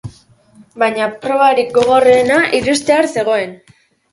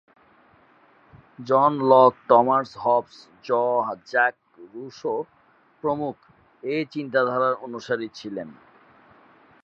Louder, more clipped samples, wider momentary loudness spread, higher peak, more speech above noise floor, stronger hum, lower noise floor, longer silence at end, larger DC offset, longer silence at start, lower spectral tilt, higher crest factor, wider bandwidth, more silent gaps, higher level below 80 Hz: first, -13 LUFS vs -22 LUFS; neither; second, 8 LU vs 20 LU; about the same, 0 dBFS vs -2 dBFS; about the same, 34 dB vs 35 dB; neither; second, -46 dBFS vs -57 dBFS; second, 0.55 s vs 1.1 s; neither; second, 0.05 s vs 1.4 s; second, -4 dB/octave vs -6.5 dB/octave; second, 14 dB vs 22 dB; first, 11.5 kHz vs 7 kHz; neither; first, -50 dBFS vs -70 dBFS